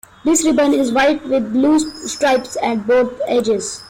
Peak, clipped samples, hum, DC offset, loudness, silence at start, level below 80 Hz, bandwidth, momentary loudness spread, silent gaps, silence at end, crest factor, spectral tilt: -6 dBFS; under 0.1%; none; under 0.1%; -16 LUFS; 0.25 s; -50 dBFS; 16.5 kHz; 5 LU; none; 0 s; 12 dB; -3.5 dB/octave